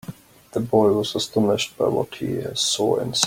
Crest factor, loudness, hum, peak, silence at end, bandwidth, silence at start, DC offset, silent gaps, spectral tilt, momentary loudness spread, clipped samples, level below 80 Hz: 22 dB; -22 LUFS; none; 0 dBFS; 0 s; 16.5 kHz; 0.1 s; under 0.1%; none; -4 dB/octave; 9 LU; under 0.1%; -58 dBFS